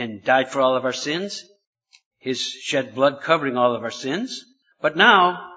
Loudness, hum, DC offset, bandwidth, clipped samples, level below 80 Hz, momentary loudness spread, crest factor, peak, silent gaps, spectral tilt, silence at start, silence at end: -20 LUFS; none; under 0.1%; 8 kHz; under 0.1%; -72 dBFS; 15 LU; 22 dB; 0 dBFS; 1.67-1.73 s, 2.06-2.11 s; -3.5 dB/octave; 0 s; 0 s